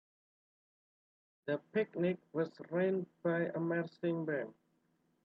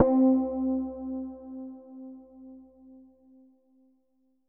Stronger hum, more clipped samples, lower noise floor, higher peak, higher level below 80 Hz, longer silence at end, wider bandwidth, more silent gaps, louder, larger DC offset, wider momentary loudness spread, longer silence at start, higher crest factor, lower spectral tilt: second, none vs 50 Hz at -115 dBFS; neither; first, -77 dBFS vs -72 dBFS; second, -22 dBFS vs -8 dBFS; second, -86 dBFS vs -60 dBFS; second, 0.7 s vs 1.55 s; first, 5.8 kHz vs 2.2 kHz; neither; second, -37 LUFS vs -28 LUFS; neither; second, 6 LU vs 26 LU; first, 1.45 s vs 0 s; second, 16 dB vs 22 dB; second, -9.5 dB/octave vs -12 dB/octave